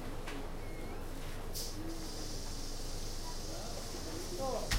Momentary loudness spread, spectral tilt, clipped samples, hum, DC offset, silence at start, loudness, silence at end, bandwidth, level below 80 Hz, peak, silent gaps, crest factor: 6 LU; -3.5 dB/octave; under 0.1%; none; under 0.1%; 0 s; -43 LUFS; 0 s; 16 kHz; -42 dBFS; -20 dBFS; none; 18 dB